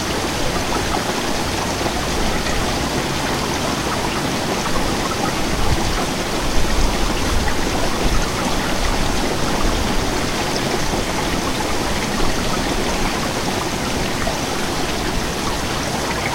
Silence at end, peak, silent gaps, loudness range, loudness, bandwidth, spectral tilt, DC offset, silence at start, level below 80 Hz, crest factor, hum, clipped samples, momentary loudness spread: 0 s; -2 dBFS; none; 1 LU; -20 LUFS; 16 kHz; -3.5 dB/octave; under 0.1%; 0 s; -26 dBFS; 16 dB; none; under 0.1%; 1 LU